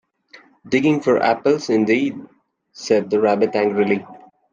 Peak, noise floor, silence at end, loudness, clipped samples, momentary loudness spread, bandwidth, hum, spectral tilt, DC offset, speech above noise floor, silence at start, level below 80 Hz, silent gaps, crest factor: -4 dBFS; -49 dBFS; 0.35 s; -18 LUFS; under 0.1%; 7 LU; 7.6 kHz; none; -6 dB/octave; under 0.1%; 31 dB; 0.65 s; -64 dBFS; none; 16 dB